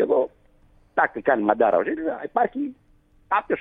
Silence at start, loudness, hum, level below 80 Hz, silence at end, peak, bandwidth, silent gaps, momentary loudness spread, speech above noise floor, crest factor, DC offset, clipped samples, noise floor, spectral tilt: 0 s; -23 LUFS; none; -60 dBFS; 0 s; -2 dBFS; 3.9 kHz; none; 10 LU; 34 dB; 22 dB; under 0.1%; under 0.1%; -56 dBFS; -8.5 dB/octave